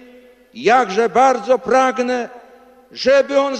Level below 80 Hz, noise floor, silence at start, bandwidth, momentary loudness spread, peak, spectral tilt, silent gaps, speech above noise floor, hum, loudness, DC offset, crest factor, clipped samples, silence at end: -58 dBFS; -46 dBFS; 0.55 s; 9.6 kHz; 9 LU; -4 dBFS; -3.5 dB/octave; none; 30 dB; none; -16 LUFS; under 0.1%; 14 dB; under 0.1%; 0 s